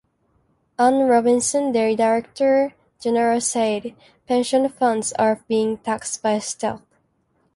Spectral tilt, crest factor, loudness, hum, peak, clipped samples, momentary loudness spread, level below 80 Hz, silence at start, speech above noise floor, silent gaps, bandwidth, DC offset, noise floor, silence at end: -3.5 dB/octave; 16 dB; -20 LUFS; none; -6 dBFS; under 0.1%; 10 LU; -62 dBFS; 0.8 s; 46 dB; none; 11.5 kHz; under 0.1%; -66 dBFS; 0.8 s